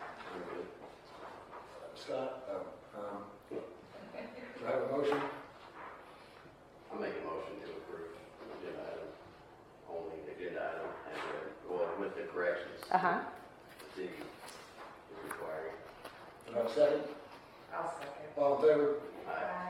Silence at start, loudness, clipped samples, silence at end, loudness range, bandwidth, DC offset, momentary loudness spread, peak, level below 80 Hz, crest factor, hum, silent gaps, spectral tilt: 0 s; -38 LUFS; under 0.1%; 0 s; 11 LU; 15.5 kHz; under 0.1%; 21 LU; -14 dBFS; -74 dBFS; 24 dB; none; none; -5.5 dB/octave